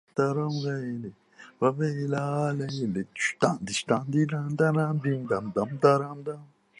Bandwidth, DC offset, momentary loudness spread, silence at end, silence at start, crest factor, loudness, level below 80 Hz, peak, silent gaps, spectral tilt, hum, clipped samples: 11 kHz; under 0.1%; 11 LU; 0.35 s; 0.15 s; 22 dB; -27 LUFS; -66 dBFS; -6 dBFS; none; -6 dB/octave; none; under 0.1%